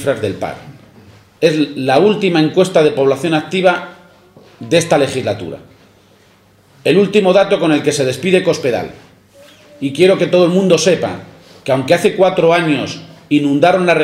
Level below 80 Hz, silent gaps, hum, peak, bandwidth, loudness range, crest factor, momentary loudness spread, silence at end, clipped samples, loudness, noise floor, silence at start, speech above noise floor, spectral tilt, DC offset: -56 dBFS; none; none; 0 dBFS; 15.5 kHz; 4 LU; 14 dB; 13 LU; 0 s; under 0.1%; -13 LUFS; -49 dBFS; 0 s; 36 dB; -5.5 dB/octave; under 0.1%